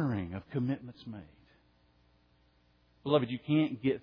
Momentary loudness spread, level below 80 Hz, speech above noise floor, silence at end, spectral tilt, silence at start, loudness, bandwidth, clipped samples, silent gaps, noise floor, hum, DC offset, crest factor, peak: 17 LU; -66 dBFS; 36 dB; 0 s; -6.5 dB/octave; 0 s; -33 LUFS; 5.2 kHz; under 0.1%; none; -68 dBFS; 60 Hz at -65 dBFS; under 0.1%; 22 dB; -12 dBFS